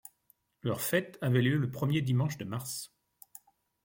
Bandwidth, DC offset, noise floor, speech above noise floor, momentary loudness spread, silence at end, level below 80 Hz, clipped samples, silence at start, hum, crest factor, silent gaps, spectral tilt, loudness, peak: 17 kHz; under 0.1%; -70 dBFS; 40 dB; 21 LU; 1 s; -68 dBFS; under 0.1%; 0.65 s; none; 18 dB; none; -5.5 dB/octave; -31 LUFS; -14 dBFS